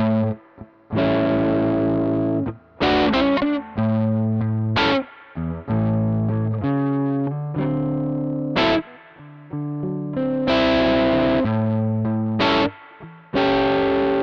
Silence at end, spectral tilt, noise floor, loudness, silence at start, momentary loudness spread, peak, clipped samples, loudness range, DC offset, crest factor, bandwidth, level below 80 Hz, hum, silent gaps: 0 s; -8 dB/octave; -44 dBFS; -21 LUFS; 0 s; 9 LU; -8 dBFS; under 0.1%; 3 LU; under 0.1%; 12 dB; 6.6 kHz; -44 dBFS; none; none